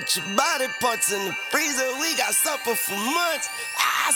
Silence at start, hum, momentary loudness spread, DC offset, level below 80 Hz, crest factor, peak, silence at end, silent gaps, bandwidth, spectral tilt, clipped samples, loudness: 0 s; none; 4 LU; under 0.1%; -70 dBFS; 22 dB; -2 dBFS; 0 s; none; over 20 kHz; -0.5 dB/octave; under 0.1%; -22 LUFS